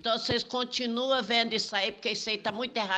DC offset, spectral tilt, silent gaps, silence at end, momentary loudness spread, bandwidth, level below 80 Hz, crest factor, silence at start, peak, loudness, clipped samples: under 0.1%; -3 dB/octave; none; 0 s; 5 LU; 9 kHz; -64 dBFS; 18 dB; 0.05 s; -12 dBFS; -29 LUFS; under 0.1%